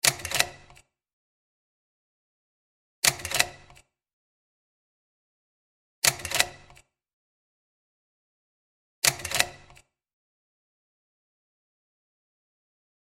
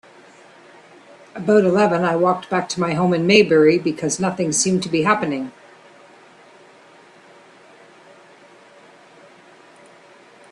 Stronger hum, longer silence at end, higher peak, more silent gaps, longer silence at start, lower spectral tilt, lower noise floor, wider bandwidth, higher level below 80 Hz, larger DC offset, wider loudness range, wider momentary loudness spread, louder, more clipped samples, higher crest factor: neither; second, 3.5 s vs 5 s; about the same, -2 dBFS vs 0 dBFS; first, 1.13-3.02 s, 4.13-6.02 s, 7.13-9.02 s vs none; second, 0.05 s vs 1.35 s; second, 0 dB/octave vs -4.5 dB/octave; first, -57 dBFS vs -48 dBFS; first, 16 kHz vs 12.5 kHz; about the same, -60 dBFS vs -62 dBFS; neither; second, 0 LU vs 9 LU; second, 4 LU vs 10 LU; second, -25 LUFS vs -18 LUFS; neither; first, 32 dB vs 20 dB